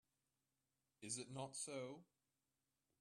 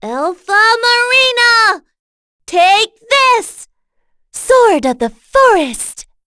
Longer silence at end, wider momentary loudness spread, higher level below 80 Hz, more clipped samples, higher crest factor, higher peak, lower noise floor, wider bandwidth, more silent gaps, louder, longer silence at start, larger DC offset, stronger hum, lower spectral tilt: first, 0.95 s vs 0.25 s; second, 10 LU vs 14 LU; second, under -90 dBFS vs -46 dBFS; neither; first, 20 dB vs 12 dB; second, -34 dBFS vs 0 dBFS; first, under -90 dBFS vs -60 dBFS; first, 13 kHz vs 11 kHz; second, none vs 1.99-2.39 s; second, -50 LUFS vs -10 LUFS; first, 1 s vs 0 s; neither; first, 50 Hz at -90 dBFS vs none; first, -3 dB/octave vs -1 dB/octave